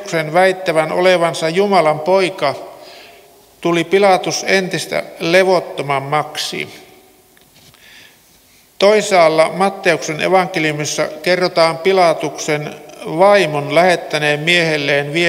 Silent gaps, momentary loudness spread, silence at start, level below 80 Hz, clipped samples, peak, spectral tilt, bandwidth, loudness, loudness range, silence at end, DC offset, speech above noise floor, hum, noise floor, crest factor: none; 9 LU; 0 s; -62 dBFS; under 0.1%; 0 dBFS; -4 dB/octave; 16.5 kHz; -14 LUFS; 5 LU; 0 s; under 0.1%; 35 dB; none; -49 dBFS; 16 dB